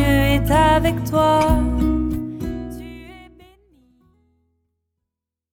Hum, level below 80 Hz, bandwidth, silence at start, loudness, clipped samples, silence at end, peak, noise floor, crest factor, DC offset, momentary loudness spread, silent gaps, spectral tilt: none; -28 dBFS; 18 kHz; 0 s; -18 LUFS; under 0.1%; 2.3 s; -4 dBFS; -83 dBFS; 16 dB; under 0.1%; 18 LU; none; -6.5 dB/octave